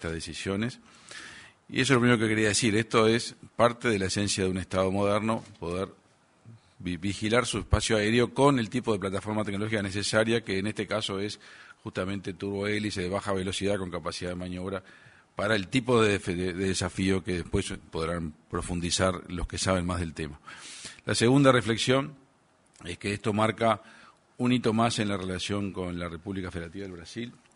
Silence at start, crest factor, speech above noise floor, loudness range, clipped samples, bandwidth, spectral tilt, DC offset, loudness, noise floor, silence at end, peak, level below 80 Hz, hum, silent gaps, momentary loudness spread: 0 s; 22 dB; 36 dB; 5 LU; under 0.1%; 11 kHz; -4.5 dB/octave; under 0.1%; -28 LUFS; -64 dBFS; 0.25 s; -6 dBFS; -48 dBFS; none; none; 15 LU